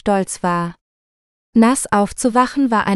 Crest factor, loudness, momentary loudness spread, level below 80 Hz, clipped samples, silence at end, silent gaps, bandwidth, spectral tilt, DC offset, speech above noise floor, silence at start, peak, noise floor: 16 dB; -17 LUFS; 6 LU; -48 dBFS; under 0.1%; 0 s; 0.81-1.53 s; 13 kHz; -5 dB/octave; under 0.1%; over 74 dB; 0.05 s; 0 dBFS; under -90 dBFS